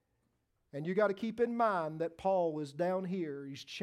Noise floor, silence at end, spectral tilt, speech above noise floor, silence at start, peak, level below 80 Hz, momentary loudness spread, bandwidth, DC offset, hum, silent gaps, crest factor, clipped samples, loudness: -79 dBFS; 0 s; -7 dB/octave; 45 dB; 0.75 s; -18 dBFS; -76 dBFS; 11 LU; 13 kHz; under 0.1%; none; none; 18 dB; under 0.1%; -35 LUFS